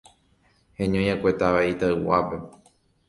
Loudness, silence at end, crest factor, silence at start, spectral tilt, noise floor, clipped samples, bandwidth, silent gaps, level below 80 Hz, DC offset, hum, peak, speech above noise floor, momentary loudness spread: -23 LUFS; 0.6 s; 18 dB; 0.8 s; -7 dB/octave; -63 dBFS; under 0.1%; 11.5 kHz; none; -48 dBFS; under 0.1%; none; -6 dBFS; 40 dB; 8 LU